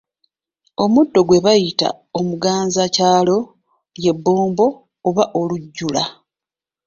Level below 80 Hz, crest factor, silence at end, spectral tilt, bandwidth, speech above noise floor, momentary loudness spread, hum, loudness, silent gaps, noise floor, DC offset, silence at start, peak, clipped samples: -56 dBFS; 16 dB; 0.75 s; -5 dB/octave; 7.6 kHz; 73 dB; 10 LU; none; -17 LUFS; none; -89 dBFS; under 0.1%; 0.8 s; -2 dBFS; under 0.1%